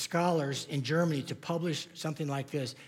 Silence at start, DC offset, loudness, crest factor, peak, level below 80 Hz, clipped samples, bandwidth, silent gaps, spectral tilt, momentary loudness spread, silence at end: 0 s; under 0.1%; -33 LUFS; 16 dB; -16 dBFS; -82 dBFS; under 0.1%; 16.5 kHz; none; -5.5 dB/octave; 7 LU; 0 s